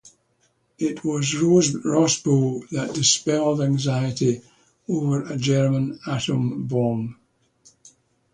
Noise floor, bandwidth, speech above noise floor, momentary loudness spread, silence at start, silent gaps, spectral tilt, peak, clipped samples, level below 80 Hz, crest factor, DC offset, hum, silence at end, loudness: -66 dBFS; 10.5 kHz; 45 dB; 10 LU; 0.05 s; none; -5 dB/octave; -4 dBFS; under 0.1%; -58 dBFS; 18 dB; under 0.1%; none; 1.2 s; -22 LUFS